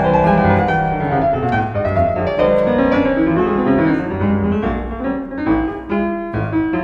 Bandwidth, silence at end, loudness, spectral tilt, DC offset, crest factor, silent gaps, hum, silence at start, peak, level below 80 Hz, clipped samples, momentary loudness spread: 6.8 kHz; 0 s; -17 LUFS; -9.5 dB/octave; under 0.1%; 16 dB; none; none; 0 s; 0 dBFS; -34 dBFS; under 0.1%; 7 LU